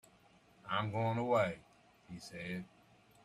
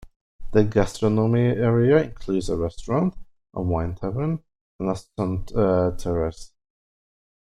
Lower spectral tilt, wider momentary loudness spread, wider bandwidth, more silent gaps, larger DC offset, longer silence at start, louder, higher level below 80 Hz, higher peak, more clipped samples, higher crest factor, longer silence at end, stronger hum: second, -6.5 dB/octave vs -8 dB/octave; first, 21 LU vs 9 LU; first, 13.5 kHz vs 11.5 kHz; second, none vs 0.16-0.39 s, 4.61-4.79 s; neither; first, 0.65 s vs 0 s; second, -37 LUFS vs -23 LUFS; second, -74 dBFS vs -40 dBFS; second, -20 dBFS vs -4 dBFS; neither; about the same, 20 dB vs 18 dB; second, 0.6 s vs 1.1 s; neither